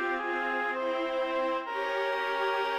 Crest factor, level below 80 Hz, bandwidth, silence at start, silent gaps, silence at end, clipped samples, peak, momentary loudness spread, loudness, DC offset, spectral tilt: 12 dB; -66 dBFS; 15.5 kHz; 0 s; none; 0 s; under 0.1%; -18 dBFS; 2 LU; -30 LUFS; under 0.1%; -2.5 dB/octave